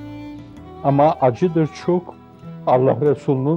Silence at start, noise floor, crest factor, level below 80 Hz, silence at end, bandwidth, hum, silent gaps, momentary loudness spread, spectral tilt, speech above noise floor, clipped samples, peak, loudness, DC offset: 0 s; -37 dBFS; 14 dB; -54 dBFS; 0 s; 8.2 kHz; none; none; 20 LU; -9 dB/octave; 20 dB; under 0.1%; -4 dBFS; -18 LUFS; under 0.1%